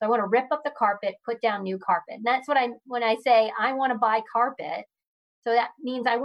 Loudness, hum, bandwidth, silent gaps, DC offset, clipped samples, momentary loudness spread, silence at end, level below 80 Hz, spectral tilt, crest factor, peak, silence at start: -25 LUFS; none; 11 kHz; 5.07-5.42 s; under 0.1%; under 0.1%; 9 LU; 0 s; -82 dBFS; -5.5 dB/octave; 16 dB; -10 dBFS; 0 s